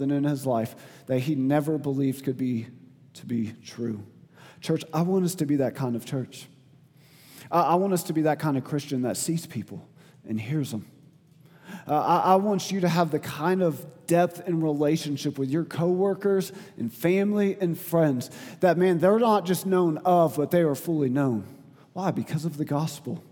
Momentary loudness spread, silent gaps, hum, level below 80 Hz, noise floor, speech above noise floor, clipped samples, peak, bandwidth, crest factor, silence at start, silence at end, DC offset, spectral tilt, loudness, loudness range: 13 LU; none; none; -74 dBFS; -55 dBFS; 30 dB; under 0.1%; -6 dBFS; 19.5 kHz; 20 dB; 0 s; 0.1 s; under 0.1%; -6.5 dB/octave; -26 LUFS; 7 LU